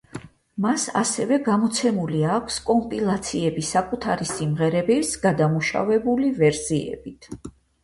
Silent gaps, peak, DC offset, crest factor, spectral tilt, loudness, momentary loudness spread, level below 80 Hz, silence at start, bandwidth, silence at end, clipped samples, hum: none; -8 dBFS; under 0.1%; 16 dB; -5 dB/octave; -22 LUFS; 15 LU; -52 dBFS; 0.15 s; 11.5 kHz; 0.35 s; under 0.1%; none